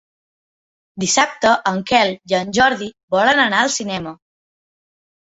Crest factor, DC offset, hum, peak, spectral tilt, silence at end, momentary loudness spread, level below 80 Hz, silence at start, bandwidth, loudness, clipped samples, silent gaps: 18 dB; under 0.1%; none; 0 dBFS; -2.5 dB/octave; 1.1 s; 11 LU; -54 dBFS; 0.95 s; 8.2 kHz; -17 LUFS; under 0.1%; 3.03-3.08 s